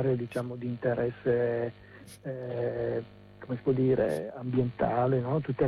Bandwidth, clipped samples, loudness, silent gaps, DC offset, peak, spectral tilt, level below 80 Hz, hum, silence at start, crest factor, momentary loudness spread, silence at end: 12.5 kHz; under 0.1%; -30 LUFS; none; under 0.1%; -16 dBFS; -8.5 dB/octave; -58 dBFS; none; 0 s; 14 dB; 13 LU; 0 s